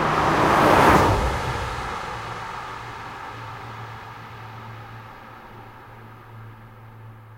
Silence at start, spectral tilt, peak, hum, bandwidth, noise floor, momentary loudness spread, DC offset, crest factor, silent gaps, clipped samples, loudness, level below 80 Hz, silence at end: 0 s; -5.5 dB/octave; -2 dBFS; none; 16 kHz; -43 dBFS; 27 LU; under 0.1%; 22 dB; none; under 0.1%; -20 LUFS; -38 dBFS; 0 s